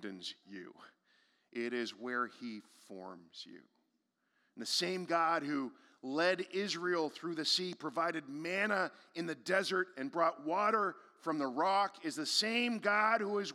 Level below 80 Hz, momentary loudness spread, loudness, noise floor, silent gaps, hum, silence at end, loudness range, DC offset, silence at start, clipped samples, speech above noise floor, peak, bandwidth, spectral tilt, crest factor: under -90 dBFS; 18 LU; -35 LUFS; -81 dBFS; none; none; 0 s; 10 LU; under 0.1%; 0 s; under 0.1%; 45 dB; -16 dBFS; 16 kHz; -3 dB/octave; 20 dB